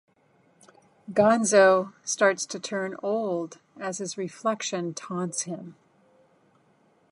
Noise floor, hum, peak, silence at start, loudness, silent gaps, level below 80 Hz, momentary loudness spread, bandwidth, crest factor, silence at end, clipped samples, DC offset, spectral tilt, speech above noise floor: -64 dBFS; none; -6 dBFS; 1.1 s; -25 LUFS; none; -76 dBFS; 16 LU; 11.5 kHz; 22 dB; 1.4 s; under 0.1%; under 0.1%; -3.5 dB/octave; 38 dB